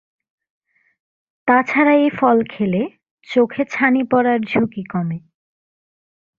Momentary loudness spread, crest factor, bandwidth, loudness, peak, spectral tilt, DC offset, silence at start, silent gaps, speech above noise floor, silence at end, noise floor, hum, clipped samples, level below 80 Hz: 10 LU; 18 dB; 7 kHz; -17 LUFS; -2 dBFS; -7.5 dB/octave; under 0.1%; 1.45 s; 3.11-3.18 s; over 73 dB; 1.2 s; under -90 dBFS; none; under 0.1%; -60 dBFS